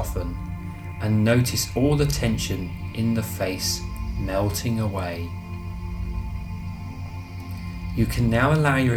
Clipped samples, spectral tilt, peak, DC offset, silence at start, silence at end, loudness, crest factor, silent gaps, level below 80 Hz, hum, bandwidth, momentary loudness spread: under 0.1%; -5.5 dB/octave; -6 dBFS; under 0.1%; 0 s; 0 s; -25 LUFS; 18 dB; none; -34 dBFS; none; over 20 kHz; 15 LU